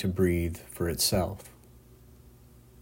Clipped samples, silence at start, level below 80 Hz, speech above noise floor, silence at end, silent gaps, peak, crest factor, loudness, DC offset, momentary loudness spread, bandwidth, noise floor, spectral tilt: under 0.1%; 0 s; -50 dBFS; 26 dB; 0.5 s; none; -12 dBFS; 20 dB; -28 LUFS; under 0.1%; 15 LU; 16.5 kHz; -54 dBFS; -4.5 dB/octave